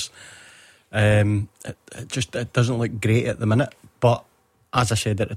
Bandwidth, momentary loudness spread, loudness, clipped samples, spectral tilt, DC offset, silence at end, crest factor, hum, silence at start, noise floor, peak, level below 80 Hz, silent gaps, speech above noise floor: 13.5 kHz; 16 LU; -22 LUFS; under 0.1%; -5.5 dB/octave; under 0.1%; 0 s; 18 dB; none; 0 s; -50 dBFS; -4 dBFS; -50 dBFS; none; 29 dB